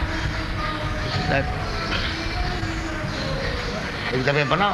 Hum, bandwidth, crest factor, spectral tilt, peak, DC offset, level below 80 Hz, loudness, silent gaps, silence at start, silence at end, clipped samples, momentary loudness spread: none; 12 kHz; 20 dB; -5 dB/octave; -4 dBFS; under 0.1%; -32 dBFS; -25 LUFS; none; 0 s; 0 s; under 0.1%; 6 LU